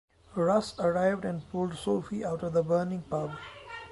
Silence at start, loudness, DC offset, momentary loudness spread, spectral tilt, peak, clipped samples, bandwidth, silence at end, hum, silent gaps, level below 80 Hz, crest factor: 0.3 s; -30 LUFS; under 0.1%; 12 LU; -7 dB/octave; -14 dBFS; under 0.1%; 11.5 kHz; 0 s; none; none; -58 dBFS; 16 dB